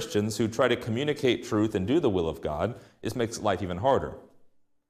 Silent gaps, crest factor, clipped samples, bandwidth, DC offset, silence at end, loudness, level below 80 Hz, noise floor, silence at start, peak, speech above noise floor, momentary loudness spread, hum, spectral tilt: none; 18 dB; under 0.1%; 15.5 kHz; under 0.1%; 0.65 s; -28 LUFS; -54 dBFS; -59 dBFS; 0 s; -10 dBFS; 32 dB; 7 LU; none; -5.5 dB/octave